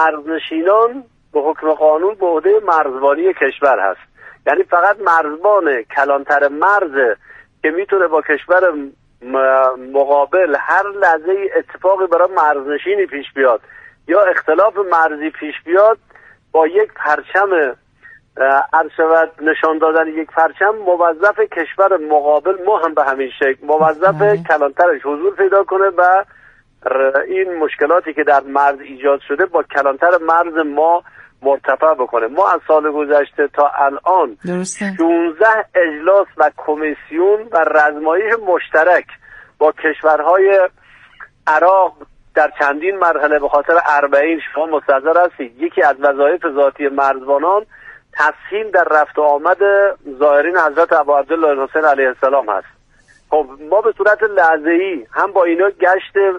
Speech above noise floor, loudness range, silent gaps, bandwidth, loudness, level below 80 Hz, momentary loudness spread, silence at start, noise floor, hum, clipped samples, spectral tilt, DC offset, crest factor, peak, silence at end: 37 dB; 2 LU; none; 10 kHz; -14 LUFS; -58 dBFS; 6 LU; 0 s; -50 dBFS; none; under 0.1%; -5 dB/octave; under 0.1%; 14 dB; 0 dBFS; 0 s